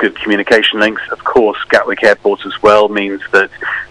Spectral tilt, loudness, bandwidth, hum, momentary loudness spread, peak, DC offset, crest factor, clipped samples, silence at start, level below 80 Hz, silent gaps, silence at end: -4 dB/octave; -12 LUFS; 12 kHz; none; 7 LU; 0 dBFS; under 0.1%; 12 dB; 0.6%; 0 s; -48 dBFS; none; 0.05 s